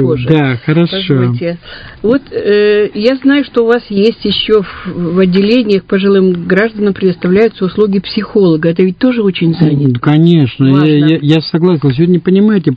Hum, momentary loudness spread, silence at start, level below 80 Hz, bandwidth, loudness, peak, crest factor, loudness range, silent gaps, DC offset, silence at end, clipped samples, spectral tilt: none; 5 LU; 0 s; -42 dBFS; 6.2 kHz; -10 LUFS; 0 dBFS; 10 dB; 2 LU; none; under 0.1%; 0 s; 0.4%; -9 dB/octave